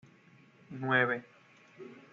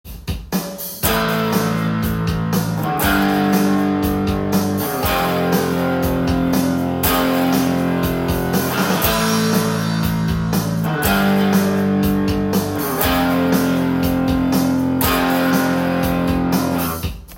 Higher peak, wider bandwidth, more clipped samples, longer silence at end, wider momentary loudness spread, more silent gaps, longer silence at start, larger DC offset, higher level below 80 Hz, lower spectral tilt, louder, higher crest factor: second, -16 dBFS vs -2 dBFS; second, 7.2 kHz vs 17 kHz; neither; first, 0.15 s vs 0 s; first, 23 LU vs 4 LU; neither; first, 0.7 s vs 0.05 s; neither; second, -82 dBFS vs -34 dBFS; second, -3.5 dB/octave vs -5.5 dB/octave; second, -31 LUFS vs -18 LUFS; first, 22 dB vs 16 dB